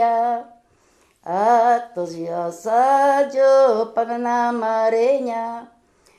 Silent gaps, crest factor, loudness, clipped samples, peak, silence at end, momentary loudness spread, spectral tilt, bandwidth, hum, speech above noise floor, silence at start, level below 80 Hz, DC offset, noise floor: none; 14 dB; -19 LUFS; under 0.1%; -6 dBFS; 0.55 s; 12 LU; -5 dB/octave; 12 kHz; none; 40 dB; 0 s; -70 dBFS; under 0.1%; -59 dBFS